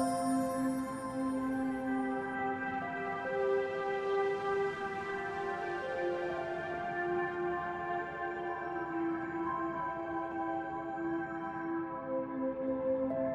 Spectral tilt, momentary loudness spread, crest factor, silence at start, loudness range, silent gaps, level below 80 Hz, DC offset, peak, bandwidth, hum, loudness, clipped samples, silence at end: -6 dB/octave; 5 LU; 14 dB; 0 s; 2 LU; none; -66 dBFS; under 0.1%; -22 dBFS; 14 kHz; none; -36 LUFS; under 0.1%; 0 s